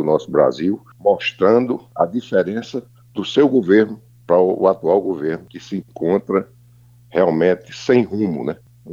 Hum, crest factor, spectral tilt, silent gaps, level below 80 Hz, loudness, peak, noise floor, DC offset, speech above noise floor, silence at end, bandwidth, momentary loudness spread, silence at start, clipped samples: none; 16 dB; -7 dB/octave; none; -60 dBFS; -18 LUFS; -2 dBFS; -48 dBFS; under 0.1%; 31 dB; 0 s; 7.4 kHz; 14 LU; 0 s; under 0.1%